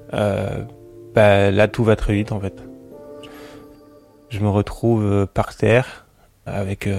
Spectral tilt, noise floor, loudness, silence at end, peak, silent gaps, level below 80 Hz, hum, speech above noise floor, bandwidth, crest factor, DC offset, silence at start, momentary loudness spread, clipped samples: -7.5 dB/octave; -48 dBFS; -19 LUFS; 0 s; -2 dBFS; none; -38 dBFS; none; 30 dB; 12.5 kHz; 18 dB; under 0.1%; 0.1 s; 24 LU; under 0.1%